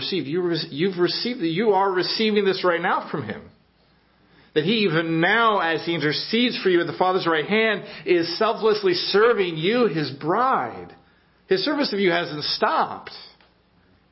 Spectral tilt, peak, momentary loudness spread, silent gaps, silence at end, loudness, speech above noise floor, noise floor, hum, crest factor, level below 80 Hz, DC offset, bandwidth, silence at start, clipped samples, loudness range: -8.5 dB/octave; -6 dBFS; 7 LU; none; 0.85 s; -21 LUFS; 38 dB; -60 dBFS; none; 18 dB; -64 dBFS; under 0.1%; 5.8 kHz; 0 s; under 0.1%; 3 LU